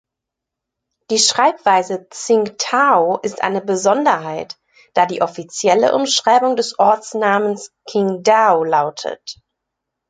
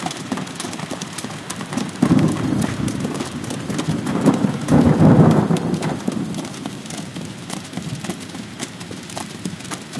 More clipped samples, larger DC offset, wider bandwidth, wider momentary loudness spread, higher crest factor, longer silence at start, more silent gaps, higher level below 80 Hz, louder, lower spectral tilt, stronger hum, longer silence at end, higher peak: neither; neither; second, 9.6 kHz vs 12 kHz; second, 13 LU vs 16 LU; about the same, 16 dB vs 20 dB; first, 1.1 s vs 0 s; neither; second, -66 dBFS vs -46 dBFS; first, -16 LUFS vs -21 LUFS; second, -2.5 dB/octave vs -6 dB/octave; neither; first, 0.75 s vs 0 s; about the same, 0 dBFS vs 0 dBFS